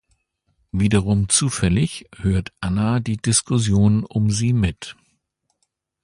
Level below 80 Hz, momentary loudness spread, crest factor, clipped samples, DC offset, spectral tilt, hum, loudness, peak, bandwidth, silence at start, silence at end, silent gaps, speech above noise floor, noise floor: -38 dBFS; 8 LU; 20 dB; under 0.1%; under 0.1%; -5 dB/octave; none; -20 LUFS; -2 dBFS; 11.5 kHz; 0.75 s; 1.1 s; none; 54 dB; -73 dBFS